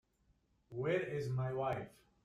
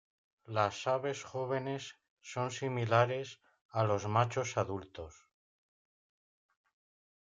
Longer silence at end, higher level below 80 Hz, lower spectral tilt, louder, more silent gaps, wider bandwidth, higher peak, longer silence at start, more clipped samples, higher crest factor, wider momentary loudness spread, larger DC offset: second, 0.35 s vs 2.2 s; about the same, -70 dBFS vs -72 dBFS; first, -7.5 dB/octave vs -5.5 dB/octave; second, -39 LUFS vs -34 LUFS; second, none vs 2.10-2.17 s, 3.61-3.69 s; first, 11.5 kHz vs 7.8 kHz; second, -24 dBFS vs -14 dBFS; first, 0.7 s vs 0.5 s; neither; about the same, 18 dB vs 22 dB; second, 11 LU vs 18 LU; neither